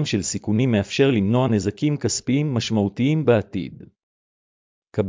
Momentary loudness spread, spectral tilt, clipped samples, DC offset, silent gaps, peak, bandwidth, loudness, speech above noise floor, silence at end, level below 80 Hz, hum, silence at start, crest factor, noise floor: 7 LU; -6 dB/octave; under 0.1%; under 0.1%; 4.03-4.82 s; -4 dBFS; 7.8 kHz; -21 LUFS; over 69 dB; 0 s; -48 dBFS; none; 0 s; 18 dB; under -90 dBFS